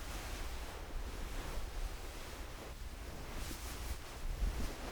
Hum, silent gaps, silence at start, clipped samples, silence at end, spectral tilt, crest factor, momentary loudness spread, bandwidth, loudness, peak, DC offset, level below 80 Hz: none; none; 0 s; under 0.1%; 0 s; -4 dB/octave; 16 dB; 6 LU; over 20 kHz; -46 LUFS; -26 dBFS; under 0.1%; -44 dBFS